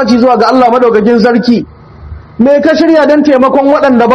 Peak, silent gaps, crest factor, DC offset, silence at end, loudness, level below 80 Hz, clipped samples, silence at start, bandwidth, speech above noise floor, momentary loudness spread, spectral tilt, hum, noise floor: 0 dBFS; none; 6 dB; under 0.1%; 0 s; -7 LUFS; -38 dBFS; 4%; 0 s; 8 kHz; 22 dB; 5 LU; -6.5 dB/octave; none; -28 dBFS